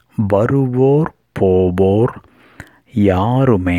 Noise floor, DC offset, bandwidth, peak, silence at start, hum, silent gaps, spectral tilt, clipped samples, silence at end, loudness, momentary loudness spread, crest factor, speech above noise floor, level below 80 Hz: -41 dBFS; under 0.1%; 10.5 kHz; 0 dBFS; 0.2 s; none; none; -9.5 dB/octave; under 0.1%; 0 s; -15 LUFS; 5 LU; 14 dB; 27 dB; -42 dBFS